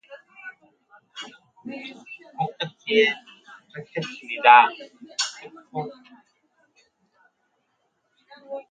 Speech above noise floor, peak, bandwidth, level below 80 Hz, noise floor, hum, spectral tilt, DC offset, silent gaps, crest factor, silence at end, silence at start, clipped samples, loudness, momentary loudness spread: 52 dB; 0 dBFS; 9.4 kHz; -78 dBFS; -72 dBFS; none; -3 dB/octave; under 0.1%; none; 26 dB; 0.1 s; 0.1 s; under 0.1%; -21 LUFS; 28 LU